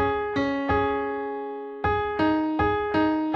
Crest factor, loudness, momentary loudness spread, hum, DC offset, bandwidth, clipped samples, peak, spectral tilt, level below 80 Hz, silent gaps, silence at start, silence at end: 14 dB; -25 LUFS; 7 LU; none; under 0.1%; 6.6 kHz; under 0.1%; -10 dBFS; -7.5 dB/octave; -44 dBFS; none; 0 s; 0 s